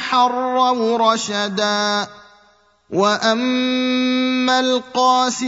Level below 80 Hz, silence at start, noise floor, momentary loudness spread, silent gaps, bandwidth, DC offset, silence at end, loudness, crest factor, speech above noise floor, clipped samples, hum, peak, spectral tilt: -68 dBFS; 0 s; -55 dBFS; 4 LU; none; 8 kHz; under 0.1%; 0 s; -17 LUFS; 16 dB; 38 dB; under 0.1%; none; -2 dBFS; -3 dB/octave